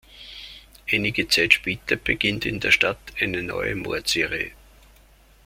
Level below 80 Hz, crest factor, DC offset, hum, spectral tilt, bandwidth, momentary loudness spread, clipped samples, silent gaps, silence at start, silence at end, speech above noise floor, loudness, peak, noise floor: -48 dBFS; 24 dB; under 0.1%; none; -3 dB/octave; 16.5 kHz; 19 LU; under 0.1%; none; 0.1 s; 0.95 s; 30 dB; -22 LUFS; 0 dBFS; -53 dBFS